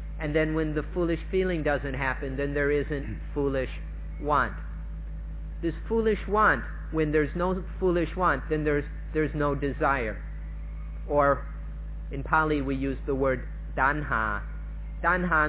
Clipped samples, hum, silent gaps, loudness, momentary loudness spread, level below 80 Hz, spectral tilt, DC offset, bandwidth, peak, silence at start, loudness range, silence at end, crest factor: under 0.1%; none; none; -28 LUFS; 14 LU; -36 dBFS; -10.5 dB/octave; under 0.1%; 4 kHz; -10 dBFS; 0 s; 3 LU; 0 s; 18 dB